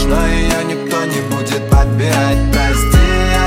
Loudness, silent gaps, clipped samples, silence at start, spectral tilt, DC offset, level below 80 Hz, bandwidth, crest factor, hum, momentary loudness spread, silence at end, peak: -14 LUFS; none; under 0.1%; 0 s; -5 dB/octave; under 0.1%; -16 dBFS; 16.5 kHz; 12 dB; none; 6 LU; 0 s; 0 dBFS